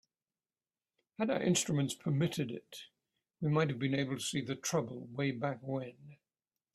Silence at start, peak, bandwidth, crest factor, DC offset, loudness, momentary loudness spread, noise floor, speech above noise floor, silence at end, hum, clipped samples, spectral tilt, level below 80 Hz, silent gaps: 1.2 s; -18 dBFS; 14.5 kHz; 20 dB; under 0.1%; -35 LUFS; 13 LU; under -90 dBFS; over 55 dB; 0.6 s; none; under 0.1%; -5 dB/octave; -74 dBFS; none